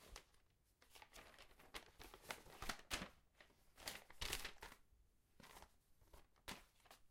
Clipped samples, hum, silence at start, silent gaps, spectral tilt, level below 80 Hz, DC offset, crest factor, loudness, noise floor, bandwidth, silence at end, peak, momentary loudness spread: under 0.1%; none; 0 s; none; -1.5 dB/octave; -66 dBFS; under 0.1%; 28 dB; -54 LUFS; -76 dBFS; 16.5 kHz; 0 s; -28 dBFS; 19 LU